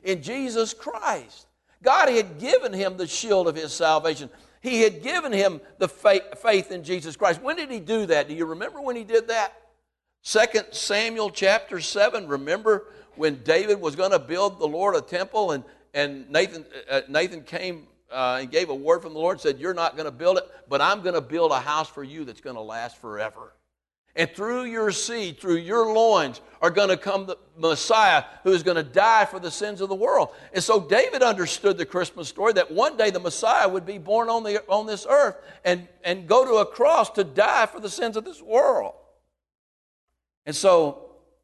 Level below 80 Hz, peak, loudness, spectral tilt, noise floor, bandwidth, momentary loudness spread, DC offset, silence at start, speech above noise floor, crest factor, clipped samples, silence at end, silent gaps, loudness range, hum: -64 dBFS; -6 dBFS; -23 LUFS; -3 dB/octave; -74 dBFS; 12.5 kHz; 12 LU; under 0.1%; 0.05 s; 52 dB; 18 dB; under 0.1%; 0.35 s; 23.98-24.04 s, 39.55-40.07 s, 40.37-40.42 s; 5 LU; none